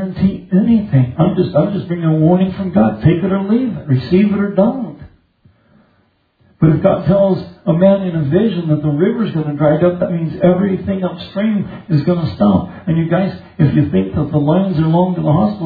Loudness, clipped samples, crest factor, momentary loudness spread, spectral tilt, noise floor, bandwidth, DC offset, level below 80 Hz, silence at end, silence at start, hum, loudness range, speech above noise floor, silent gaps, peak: -15 LUFS; under 0.1%; 14 dB; 5 LU; -12 dB/octave; -58 dBFS; 4.9 kHz; under 0.1%; -42 dBFS; 0 s; 0 s; none; 3 LU; 44 dB; none; 0 dBFS